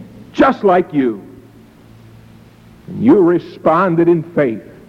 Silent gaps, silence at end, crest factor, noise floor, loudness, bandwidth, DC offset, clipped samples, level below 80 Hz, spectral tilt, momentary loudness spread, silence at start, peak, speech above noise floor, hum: none; 0.25 s; 14 dB; -42 dBFS; -14 LUFS; 6.8 kHz; under 0.1%; under 0.1%; -50 dBFS; -8.5 dB/octave; 9 LU; 0 s; -2 dBFS; 29 dB; none